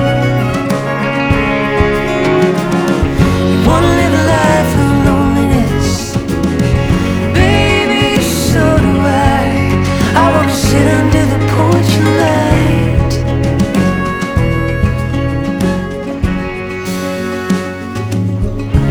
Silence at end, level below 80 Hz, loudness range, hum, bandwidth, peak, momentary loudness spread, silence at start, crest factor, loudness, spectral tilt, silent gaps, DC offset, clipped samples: 0 s; -22 dBFS; 5 LU; none; 19.5 kHz; 0 dBFS; 7 LU; 0 s; 12 dB; -12 LUFS; -6 dB/octave; none; under 0.1%; under 0.1%